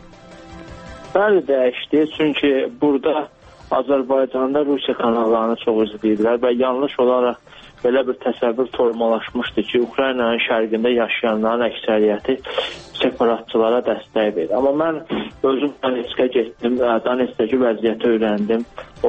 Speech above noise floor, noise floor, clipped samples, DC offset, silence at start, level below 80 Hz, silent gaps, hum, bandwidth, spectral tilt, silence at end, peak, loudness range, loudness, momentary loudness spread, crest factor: 23 dB; -41 dBFS; under 0.1%; under 0.1%; 0.05 s; -52 dBFS; none; none; 8.2 kHz; -6.5 dB/octave; 0 s; -2 dBFS; 1 LU; -19 LUFS; 5 LU; 16 dB